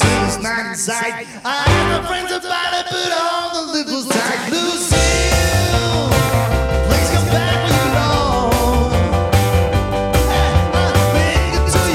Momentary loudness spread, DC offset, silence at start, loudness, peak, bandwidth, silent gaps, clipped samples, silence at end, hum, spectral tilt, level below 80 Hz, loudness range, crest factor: 6 LU; under 0.1%; 0 s; -16 LUFS; 0 dBFS; 16.5 kHz; none; under 0.1%; 0 s; none; -4.5 dB/octave; -24 dBFS; 3 LU; 14 dB